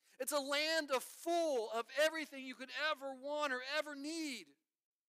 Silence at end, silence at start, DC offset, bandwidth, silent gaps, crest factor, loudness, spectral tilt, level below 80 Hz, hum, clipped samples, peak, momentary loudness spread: 0.7 s; 0.2 s; under 0.1%; 15.5 kHz; none; 18 dB; -39 LUFS; 0 dB/octave; under -90 dBFS; none; under 0.1%; -22 dBFS; 9 LU